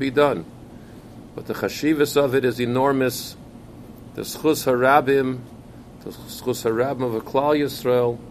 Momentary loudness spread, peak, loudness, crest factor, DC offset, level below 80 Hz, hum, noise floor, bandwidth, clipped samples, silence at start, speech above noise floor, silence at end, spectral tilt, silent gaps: 23 LU; 0 dBFS; -21 LUFS; 22 dB; under 0.1%; -52 dBFS; none; -42 dBFS; 15.5 kHz; under 0.1%; 0 s; 21 dB; 0 s; -5.5 dB/octave; none